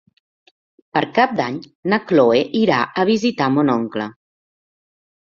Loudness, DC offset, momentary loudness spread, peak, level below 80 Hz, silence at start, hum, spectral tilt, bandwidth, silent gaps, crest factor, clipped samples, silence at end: -18 LUFS; under 0.1%; 11 LU; -2 dBFS; -60 dBFS; 0.95 s; none; -6 dB/octave; 7.4 kHz; 1.75-1.83 s; 18 dB; under 0.1%; 1.25 s